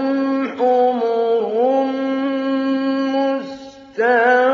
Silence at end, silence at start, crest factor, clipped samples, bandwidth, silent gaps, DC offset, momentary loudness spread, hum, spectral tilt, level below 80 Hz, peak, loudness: 0 s; 0 s; 14 dB; under 0.1%; 7 kHz; none; under 0.1%; 6 LU; none; -5.5 dB/octave; -68 dBFS; -4 dBFS; -18 LUFS